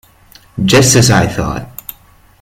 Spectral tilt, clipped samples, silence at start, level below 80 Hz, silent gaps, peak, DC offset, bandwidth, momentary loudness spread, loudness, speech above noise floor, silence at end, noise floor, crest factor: -4 dB/octave; under 0.1%; 0.55 s; -34 dBFS; none; 0 dBFS; under 0.1%; 16.5 kHz; 21 LU; -10 LUFS; 35 dB; 0.7 s; -44 dBFS; 14 dB